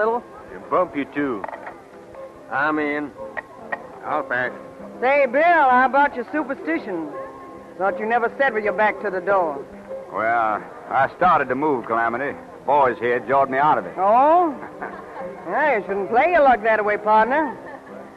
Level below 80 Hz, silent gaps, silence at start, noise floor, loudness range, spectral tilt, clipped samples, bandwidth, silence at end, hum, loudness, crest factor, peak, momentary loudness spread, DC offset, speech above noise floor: -58 dBFS; none; 0 s; -40 dBFS; 7 LU; -6.5 dB/octave; under 0.1%; 10 kHz; 0 s; none; -20 LUFS; 14 dB; -6 dBFS; 18 LU; under 0.1%; 21 dB